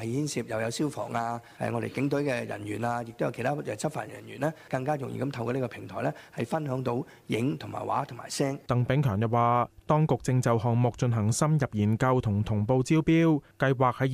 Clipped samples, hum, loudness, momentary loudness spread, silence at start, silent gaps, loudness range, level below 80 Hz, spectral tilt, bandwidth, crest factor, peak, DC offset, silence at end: under 0.1%; none; -28 LUFS; 8 LU; 0 s; none; 7 LU; -56 dBFS; -6.5 dB/octave; 15 kHz; 18 dB; -10 dBFS; under 0.1%; 0 s